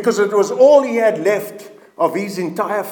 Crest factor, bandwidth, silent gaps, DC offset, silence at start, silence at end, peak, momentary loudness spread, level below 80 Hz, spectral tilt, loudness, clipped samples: 16 dB; 19 kHz; none; under 0.1%; 0 s; 0 s; 0 dBFS; 11 LU; -78 dBFS; -5 dB/octave; -16 LUFS; under 0.1%